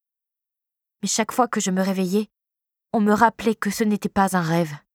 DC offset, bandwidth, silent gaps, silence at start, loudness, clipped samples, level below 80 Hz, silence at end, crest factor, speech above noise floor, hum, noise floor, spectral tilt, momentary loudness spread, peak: under 0.1%; 18.5 kHz; none; 1.05 s; -22 LUFS; under 0.1%; -58 dBFS; 0.15 s; 22 dB; 66 dB; none; -87 dBFS; -5 dB/octave; 7 LU; -2 dBFS